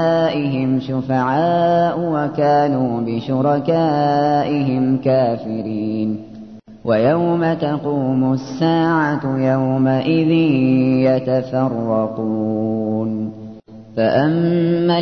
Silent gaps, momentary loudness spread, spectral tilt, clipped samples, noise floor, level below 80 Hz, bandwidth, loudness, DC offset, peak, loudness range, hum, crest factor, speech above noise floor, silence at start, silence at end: none; 7 LU; -9 dB/octave; under 0.1%; -37 dBFS; -56 dBFS; 6.4 kHz; -17 LUFS; 0.2%; -4 dBFS; 3 LU; none; 12 dB; 21 dB; 0 s; 0 s